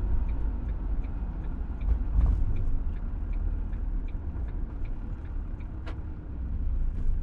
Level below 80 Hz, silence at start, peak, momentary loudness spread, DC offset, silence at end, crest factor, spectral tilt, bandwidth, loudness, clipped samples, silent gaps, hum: -30 dBFS; 0 s; -14 dBFS; 10 LU; under 0.1%; 0 s; 14 dB; -10 dB/octave; 3.3 kHz; -34 LUFS; under 0.1%; none; none